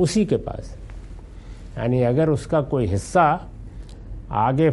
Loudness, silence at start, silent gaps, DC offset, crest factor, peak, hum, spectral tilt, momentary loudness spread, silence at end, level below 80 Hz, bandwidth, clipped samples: -21 LUFS; 0 s; none; under 0.1%; 18 dB; -4 dBFS; none; -7 dB/octave; 22 LU; 0 s; -38 dBFS; 11.5 kHz; under 0.1%